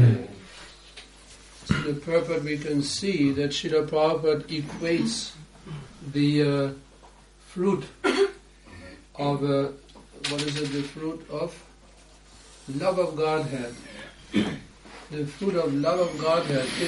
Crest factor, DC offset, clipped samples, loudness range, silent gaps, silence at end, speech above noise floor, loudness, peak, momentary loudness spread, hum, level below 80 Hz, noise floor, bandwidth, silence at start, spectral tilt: 20 dB; under 0.1%; under 0.1%; 5 LU; none; 0 s; 26 dB; -26 LUFS; -8 dBFS; 21 LU; none; -54 dBFS; -52 dBFS; 11.5 kHz; 0 s; -6 dB/octave